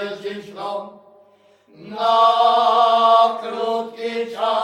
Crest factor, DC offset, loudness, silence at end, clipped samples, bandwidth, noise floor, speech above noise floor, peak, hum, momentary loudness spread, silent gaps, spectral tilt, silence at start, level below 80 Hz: 16 dB; under 0.1%; -17 LUFS; 0 s; under 0.1%; 10 kHz; -53 dBFS; 34 dB; -2 dBFS; none; 16 LU; none; -3.5 dB/octave; 0 s; -76 dBFS